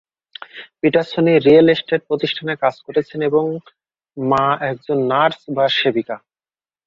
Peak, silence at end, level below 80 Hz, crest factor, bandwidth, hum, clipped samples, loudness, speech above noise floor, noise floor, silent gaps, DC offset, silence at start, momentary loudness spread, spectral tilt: -2 dBFS; 0.7 s; -58 dBFS; 16 dB; 7.2 kHz; none; under 0.1%; -17 LUFS; over 73 dB; under -90 dBFS; none; under 0.1%; 0.55 s; 19 LU; -7 dB/octave